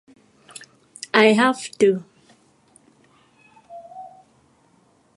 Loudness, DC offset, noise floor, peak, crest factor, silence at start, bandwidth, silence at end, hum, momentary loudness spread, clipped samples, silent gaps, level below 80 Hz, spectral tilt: -18 LUFS; under 0.1%; -59 dBFS; 0 dBFS; 24 dB; 1.15 s; 11.5 kHz; 1.1 s; none; 27 LU; under 0.1%; none; -74 dBFS; -4.5 dB/octave